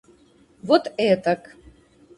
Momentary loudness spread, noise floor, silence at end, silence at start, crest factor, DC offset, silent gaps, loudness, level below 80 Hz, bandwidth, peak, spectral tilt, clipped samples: 9 LU; -56 dBFS; 0.8 s; 0.65 s; 22 dB; under 0.1%; none; -21 LUFS; -60 dBFS; 11.5 kHz; -2 dBFS; -6 dB/octave; under 0.1%